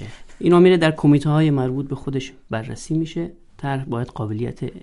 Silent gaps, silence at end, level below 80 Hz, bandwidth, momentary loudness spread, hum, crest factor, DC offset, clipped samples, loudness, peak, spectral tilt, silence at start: none; 0.05 s; -44 dBFS; 11.5 kHz; 15 LU; none; 18 dB; under 0.1%; under 0.1%; -20 LUFS; -2 dBFS; -7.5 dB/octave; 0 s